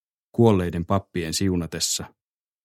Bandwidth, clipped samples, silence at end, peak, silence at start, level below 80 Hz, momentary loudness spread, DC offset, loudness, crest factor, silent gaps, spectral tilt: 16 kHz; under 0.1%; 0.55 s; -6 dBFS; 0.35 s; -48 dBFS; 9 LU; under 0.1%; -23 LUFS; 18 dB; none; -5 dB/octave